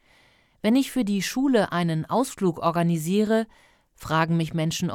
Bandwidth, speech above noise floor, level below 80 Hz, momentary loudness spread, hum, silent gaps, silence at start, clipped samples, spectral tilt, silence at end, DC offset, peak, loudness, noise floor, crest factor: 17 kHz; 36 dB; -58 dBFS; 4 LU; none; none; 0.65 s; under 0.1%; -6 dB/octave; 0 s; under 0.1%; -8 dBFS; -24 LUFS; -60 dBFS; 16 dB